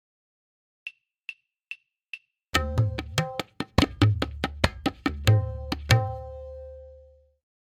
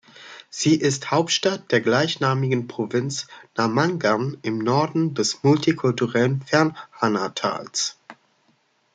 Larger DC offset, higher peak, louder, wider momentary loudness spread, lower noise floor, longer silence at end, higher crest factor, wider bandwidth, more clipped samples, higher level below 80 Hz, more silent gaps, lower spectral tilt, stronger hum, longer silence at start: neither; first, 0 dBFS vs -4 dBFS; second, -26 LUFS vs -22 LUFS; first, 19 LU vs 7 LU; second, -54 dBFS vs -64 dBFS; second, 0.65 s vs 0.8 s; first, 28 dB vs 20 dB; first, 16 kHz vs 9.4 kHz; neither; first, -42 dBFS vs -66 dBFS; neither; about the same, -5.5 dB/octave vs -4.5 dB/octave; neither; first, 0.85 s vs 0.2 s